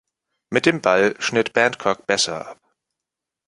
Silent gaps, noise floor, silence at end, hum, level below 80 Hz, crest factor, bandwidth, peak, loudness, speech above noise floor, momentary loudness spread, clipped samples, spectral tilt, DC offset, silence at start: none; -85 dBFS; 0.95 s; none; -62 dBFS; 22 dB; 11.5 kHz; 0 dBFS; -19 LUFS; 66 dB; 7 LU; under 0.1%; -3 dB/octave; under 0.1%; 0.5 s